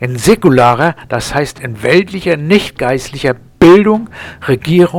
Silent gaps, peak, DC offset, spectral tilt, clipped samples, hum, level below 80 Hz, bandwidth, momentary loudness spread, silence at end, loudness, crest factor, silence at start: none; 0 dBFS; under 0.1%; -6 dB/octave; 0.4%; none; -36 dBFS; 16.5 kHz; 11 LU; 0 s; -11 LUFS; 10 dB; 0 s